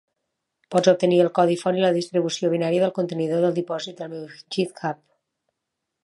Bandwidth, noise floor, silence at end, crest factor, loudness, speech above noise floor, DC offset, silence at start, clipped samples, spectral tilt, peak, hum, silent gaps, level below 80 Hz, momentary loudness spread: 11.5 kHz; -81 dBFS; 1.1 s; 20 dB; -22 LUFS; 60 dB; under 0.1%; 0.7 s; under 0.1%; -6 dB/octave; -4 dBFS; none; none; -74 dBFS; 13 LU